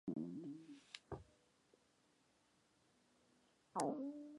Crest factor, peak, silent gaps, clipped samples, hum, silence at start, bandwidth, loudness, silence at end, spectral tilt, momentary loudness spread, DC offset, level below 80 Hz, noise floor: 30 dB; -22 dBFS; none; under 0.1%; none; 0.05 s; 11 kHz; -48 LUFS; 0 s; -5.5 dB/octave; 14 LU; under 0.1%; -76 dBFS; -78 dBFS